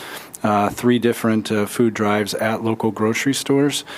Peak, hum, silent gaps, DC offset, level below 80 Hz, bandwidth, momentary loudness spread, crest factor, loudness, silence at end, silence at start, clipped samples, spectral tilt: -4 dBFS; none; none; under 0.1%; -58 dBFS; 16 kHz; 4 LU; 16 dB; -19 LUFS; 0 s; 0 s; under 0.1%; -5 dB/octave